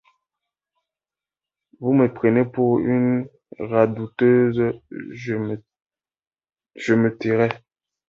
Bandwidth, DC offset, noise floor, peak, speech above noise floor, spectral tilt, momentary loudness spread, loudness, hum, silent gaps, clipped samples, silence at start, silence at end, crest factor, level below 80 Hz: 7.4 kHz; under 0.1%; under -90 dBFS; -4 dBFS; over 70 dB; -8.5 dB/octave; 16 LU; -20 LUFS; none; 6.27-6.31 s; under 0.1%; 1.8 s; 0.5 s; 18 dB; -60 dBFS